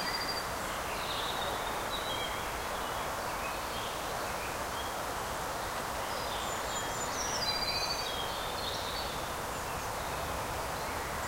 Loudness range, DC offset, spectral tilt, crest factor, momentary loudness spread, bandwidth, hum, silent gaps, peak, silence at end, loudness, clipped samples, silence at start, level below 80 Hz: 2 LU; under 0.1%; -2.5 dB/octave; 16 dB; 4 LU; 16 kHz; none; none; -18 dBFS; 0 s; -35 LUFS; under 0.1%; 0 s; -50 dBFS